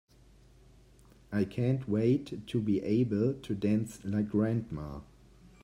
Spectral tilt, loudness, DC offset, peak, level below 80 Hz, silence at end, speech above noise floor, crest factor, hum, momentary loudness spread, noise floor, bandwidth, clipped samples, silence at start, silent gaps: -8.5 dB/octave; -31 LUFS; under 0.1%; -16 dBFS; -58 dBFS; 0.6 s; 29 dB; 16 dB; none; 9 LU; -59 dBFS; 12.5 kHz; under 0.1%; 1.3 s; none